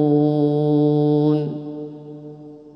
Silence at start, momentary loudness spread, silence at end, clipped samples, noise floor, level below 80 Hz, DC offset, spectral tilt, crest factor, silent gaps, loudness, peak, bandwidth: 0 s; 20 LU; 0.05 s; under 0.1%; -39 dBFS; -68 dBFS; under 0.1%; -11.5 dB/octave; 12 dB; none; -18 LUFS; -6 dBFS; 5.6 kHz